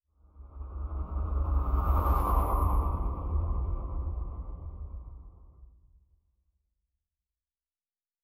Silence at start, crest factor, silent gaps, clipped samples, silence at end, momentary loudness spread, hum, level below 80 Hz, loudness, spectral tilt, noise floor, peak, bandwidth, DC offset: 0.35 s; 18 dB; none; under 0.1%; 2.55 s; 17 LU; none; -32 dBFS; -32 LUFS; -9 dB/octave; under -90 dBFS; -14 dBFS; 15.5 kHz; under 0.1%